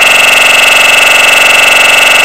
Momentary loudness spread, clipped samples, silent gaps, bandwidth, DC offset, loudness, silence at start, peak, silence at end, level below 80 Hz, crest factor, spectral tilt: 0 LU; 10%; none; over 20 kHz; 2%; -2 LUFS; 0 s; 0 dBFS; 0 s; -38 dBFS; 4 dB; 1 dB/octave